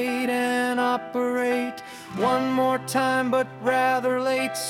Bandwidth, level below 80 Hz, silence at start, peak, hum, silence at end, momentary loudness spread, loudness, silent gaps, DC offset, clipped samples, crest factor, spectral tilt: 17 kHz; -68 dBFS; 0 s; -10 dBFS; none; 0 s; 4 LU; -24 LUFS; none; under 0.1%; under 0.1%; 14 dB; -4 dB/octave